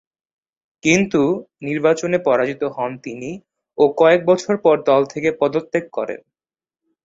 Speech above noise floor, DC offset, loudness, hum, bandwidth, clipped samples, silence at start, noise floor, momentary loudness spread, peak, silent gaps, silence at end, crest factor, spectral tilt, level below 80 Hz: over 72 dB; under 0.1%; -18 LUFS; none; 8 kHz; under 0.1%; 0.85 s; under -90 dBFS; 15 LU; -2 dBFS; none; 0.9 s; 18 dB; -5.5 dB/octave; -60 dBFS